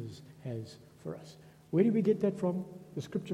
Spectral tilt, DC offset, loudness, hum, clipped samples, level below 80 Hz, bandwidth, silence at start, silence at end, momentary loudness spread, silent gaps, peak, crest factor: -8.5 dB/octave; under 0.1%; -32 LUFS; none; under 0.1%; -72 dBFS; 13 kHz; 0 s; 0 s; 19 LU; none; -14 dBFS; 20 dB